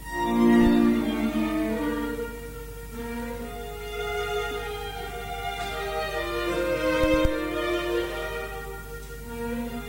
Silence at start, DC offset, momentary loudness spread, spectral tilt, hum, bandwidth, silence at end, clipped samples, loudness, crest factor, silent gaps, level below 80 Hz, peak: 0 s; under 0.1%; 16 LU; -5.5 dB/octave; 50 Hz at -40 dBFS; 17 kHz; 0 s; under 0.1%; -27 LUFS; 18 dB; none; -38 dBFS; -8 dBFS